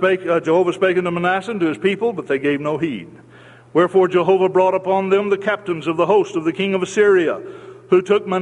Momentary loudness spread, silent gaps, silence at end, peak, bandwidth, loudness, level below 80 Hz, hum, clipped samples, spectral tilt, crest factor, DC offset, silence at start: 7 LU; none; 0 s; -2 dBFS; 10 kHz; -18 LUFS; -62 dBFS; none; under 0.1%; -6 dB/octave; 16 dB; under 0.1%; 0 s